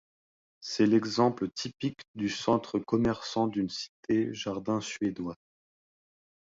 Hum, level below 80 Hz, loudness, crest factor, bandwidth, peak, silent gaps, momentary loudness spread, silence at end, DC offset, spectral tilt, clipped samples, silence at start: none; -62 dBFS; -30 LUFS; 20 dB; 7.8 kHz; -12 dBFS; 2.08-2.14 s, 3.89-4.03 s; 11 LU; 1.15 s; under 0.1%; -5.5 dB/octave; under 0.1%; 0.6 s